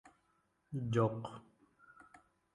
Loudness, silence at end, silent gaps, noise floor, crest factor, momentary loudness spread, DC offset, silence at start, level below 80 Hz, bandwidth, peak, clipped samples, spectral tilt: -38 LUFS; 1.15 s; none; -78 dBFS; 22 dB; 22 LU; under 0.1%; 0.05 s; -70 dBFS; 11 kHz; -20 dBFS; under 0.1%; -8 dB/octave